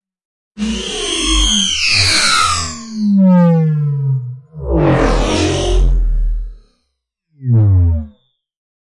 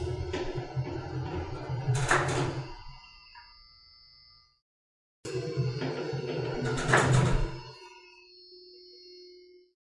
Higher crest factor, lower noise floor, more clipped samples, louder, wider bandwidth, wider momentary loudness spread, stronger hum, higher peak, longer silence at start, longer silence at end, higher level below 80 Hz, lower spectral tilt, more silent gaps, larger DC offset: second, 14 dB vs 26 dB; first, -71 dBFS vs -59 dBFS; neither; first, -13 LUFS vs -30 LUFS; about the same, 11.5 kHz vs 11.5 kHz; second, 14 LU vs 25 LU; neither; first, 0 dBFS vs -6 dBFS; first, 0.55 s vs 0 s; first, 0.85 s vs 0.4 s; first, -22 dBFS vs -44 dBFS; about the same, -4.5 dB/octave vs -5.5 dB/octave; second, none vs 4.62-5.23 s; neither